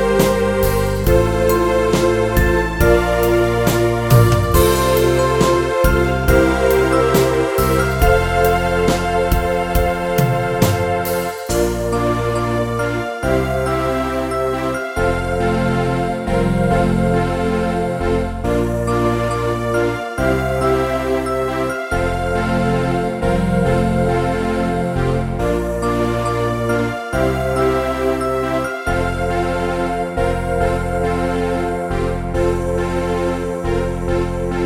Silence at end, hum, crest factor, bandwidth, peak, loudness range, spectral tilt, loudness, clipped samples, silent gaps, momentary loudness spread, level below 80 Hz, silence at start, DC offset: 0 s; none; 16 dB; 17.5 kHz; 0 dBFS; 5 LU; -6 dB/octave; -17 LUFS; under 0.1%; none; 6 LU; -26 dBFS; 0 s; under 0.1%